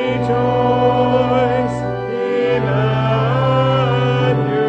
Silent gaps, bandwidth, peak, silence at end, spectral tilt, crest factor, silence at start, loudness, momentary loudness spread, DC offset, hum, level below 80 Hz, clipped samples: none; 8 kHz; -2 dBFS; 0 s; -8 dB/octave; 14 dB; 0 s; -16 LUFS; 5 LU; under 0.1%; none; -42 dBFS; under 0.1%